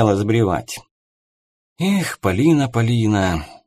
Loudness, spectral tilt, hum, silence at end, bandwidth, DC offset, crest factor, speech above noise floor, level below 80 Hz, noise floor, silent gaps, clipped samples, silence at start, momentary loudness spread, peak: -18 LUFS; -6.5 dB/octave; none; 0.15 s; 15.5 kHz; under 0.1%; 18 dB; over 72 dB; -42 dBFS; under -90 dBFS; 0.91-1.76 s; under 0.1%; 0 s; 9 LU; -2 dBFS